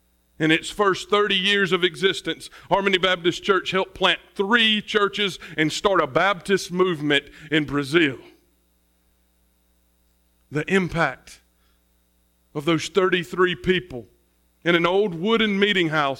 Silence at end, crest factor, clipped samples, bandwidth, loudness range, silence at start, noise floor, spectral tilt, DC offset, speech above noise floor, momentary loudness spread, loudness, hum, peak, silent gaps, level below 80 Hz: 0 s; 20 dB; under 0.1%; 16 kHz; 8 LU; 0.4 s; -64 dBFS; -4.5 dB/octave; under 0.1%; 43 dB; 7 LU; -21 LUFS; none; -4 dBFS; none; -54 dBFS